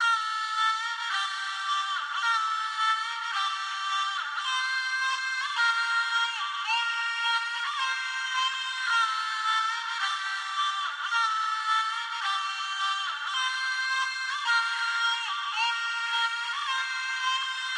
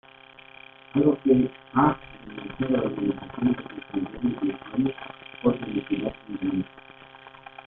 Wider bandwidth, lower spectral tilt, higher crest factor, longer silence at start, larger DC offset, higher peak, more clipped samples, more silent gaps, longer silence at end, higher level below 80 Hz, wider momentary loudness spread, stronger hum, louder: first, 11.5 kHz vs 3.9 kHz; second, 9.5 dB/octave vs -11 dB/octave; second, 14 dB vs 22 dB; second, 0 s vs 0.95 s; neither; second, -14 dBFS vs -6 dBFS; neither; neither; second, 0 s vs 0.25 s; second, under -90 dBFS vs -54 dBFS; second, 4 LU vs 23 LU; neither; about the same, -27 LUFS vs -26 LUFS